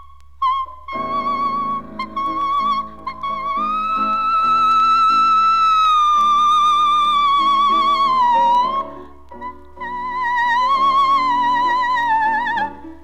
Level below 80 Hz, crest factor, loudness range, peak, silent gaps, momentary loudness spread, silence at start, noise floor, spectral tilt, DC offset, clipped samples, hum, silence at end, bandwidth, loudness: -48 dBFS; 10 dB; 8 LU; -8 dBFS; none; 13 LU; 0 s; -37 dBFS; -2.5 dB/octave; 0.9%; under 0.1%; none; 0.05 s; 11.5 kHz; -16 LUFS